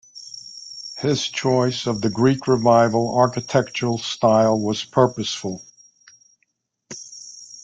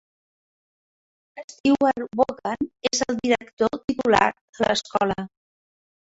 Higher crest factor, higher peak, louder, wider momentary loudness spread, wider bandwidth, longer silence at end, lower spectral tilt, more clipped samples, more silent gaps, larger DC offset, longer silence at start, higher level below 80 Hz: second, 18 dB vs 24 dB; about the same, -2 dBFS vs -2 dBFS; first, -20 LUFS vs -23 LUFS; first, 20 LU vs 9 LU; first, 9.4 kHz vs 8 kHz; second, 0 s vs 0.85 s; first, -5.5 dB/octave vs -3.5 dB/octave; neither; second, none vs 1.44-1.48 s, 1.60-1.64 s, 3.53-3.57 s, 3.84-3.88 s, 4.41-4.53 s; neither; second, 0.15 s vs 1.35 s; about the same, -58 dBFS vs -56 dBFS